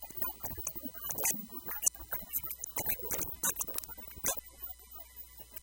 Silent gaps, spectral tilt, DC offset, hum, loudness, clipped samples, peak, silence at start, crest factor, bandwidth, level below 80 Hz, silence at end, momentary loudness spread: none; -1.5 dB/octave; under 0.1%; none; -35 LUFS; under 0.1%; -12 dBFS; 0 s; 28 dB; 17.5 kHz; -58 dBFS; 0 s; 14 LU